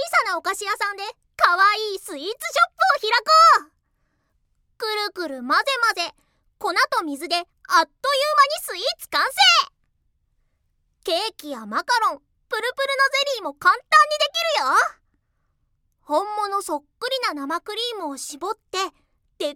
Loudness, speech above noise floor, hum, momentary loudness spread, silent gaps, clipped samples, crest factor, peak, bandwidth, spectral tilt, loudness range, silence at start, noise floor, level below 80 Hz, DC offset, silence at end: -20 LUFS; 49 dB; none; 15 LU; none; under 0.1%; 20 dB; -2 dBFS; 18 kHz; 0 dB/octave; 8 LU; 0 s; -70 dBFS; -66 dBFS; under 0.1%; 0 s